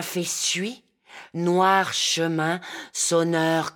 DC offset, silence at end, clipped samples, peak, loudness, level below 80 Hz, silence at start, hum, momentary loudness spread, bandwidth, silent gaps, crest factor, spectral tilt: under 0.1%; 0.05 s; under 0.1%; -6 dBFS; -23 LUFS; -76 dBFS; 0 s; none; 11 LU; 19 kHz; none; 18 dB; -3 dB/octave